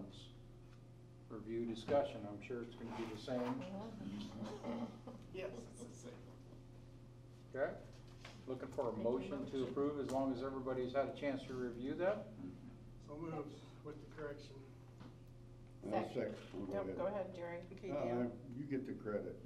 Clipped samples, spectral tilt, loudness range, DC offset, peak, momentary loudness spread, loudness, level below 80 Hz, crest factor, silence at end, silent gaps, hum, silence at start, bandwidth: under 0.1%; -7 dB/octave; 9 LU; under 0.1%; -24 dBFS; 19 LU; -44 LUFS; -64 dBFS; 20 dB; 0 s; none; none; 0 s; 13 kHz